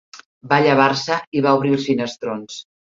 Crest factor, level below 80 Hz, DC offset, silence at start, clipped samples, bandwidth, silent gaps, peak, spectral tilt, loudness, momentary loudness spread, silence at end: 18 dB; -62 dBFS; under 0.1%; 0.15 s; under 0.1%; 7.6 kHz; 0.26-0.41 s, 1.27-1.32 s; -2 dBFS; -5.5 dB/octave; -18 LUFS; 13 LU; 0.3 s